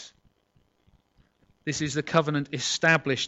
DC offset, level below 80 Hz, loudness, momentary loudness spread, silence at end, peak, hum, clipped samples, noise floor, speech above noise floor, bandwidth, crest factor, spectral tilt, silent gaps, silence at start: under 0.1%; -62 dBFS; -26 LUFS; 13 LU; 0 s; -6 dBFS; none; under 0.1%; -68 dBFS; 42 dB; 8.2 kHz; 22 dB; -4 dB/octave; none; 0 s